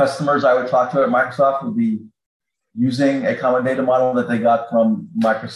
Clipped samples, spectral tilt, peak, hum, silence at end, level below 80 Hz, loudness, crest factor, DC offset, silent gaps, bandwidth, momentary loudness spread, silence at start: under 0.1%; -7 dB/octave; -4 dBFS; none; 0 s; -64 dBFS; -18 LUFS; 12 dB; under 0.1%; 2.26-2.40 s; 11.5 kHz; 5 LU; 0 s